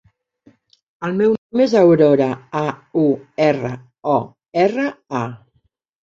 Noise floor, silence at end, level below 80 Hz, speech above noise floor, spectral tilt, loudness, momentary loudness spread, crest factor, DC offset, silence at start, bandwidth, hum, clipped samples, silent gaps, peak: -65 dBFS; 0.65 s; -60 dBFS; 48 dB; -7.5 dB/octave; -18 LUFS; 13 LU; 16 dB; under 0.1%; 1 s; 7.6 kHz; none; under 0.1%; 1.38-1.50 s; -2 dBFS